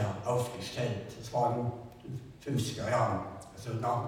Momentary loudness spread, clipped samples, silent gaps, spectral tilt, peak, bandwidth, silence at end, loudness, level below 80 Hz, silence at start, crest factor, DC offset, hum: 14 LU; under 0.1%; none; -6 dB/octave; -16 dBFS; 16.5 kHz; 0 s; -34 LUFS; -60 dBFS; 0 s; 18 dB; under 0.1%; none